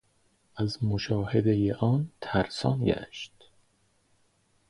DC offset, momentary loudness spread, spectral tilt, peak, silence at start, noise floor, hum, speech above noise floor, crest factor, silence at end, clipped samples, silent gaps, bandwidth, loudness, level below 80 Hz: under 0.1%; 15 LU; -7.5 dB/octave; -10 dBFS; 0.55 s; -68 dBFS; none; 41 dB; 20 dB; 1.4 s; under 0.1%; none; 11 kHz; -28 LUFS; -52 dBFS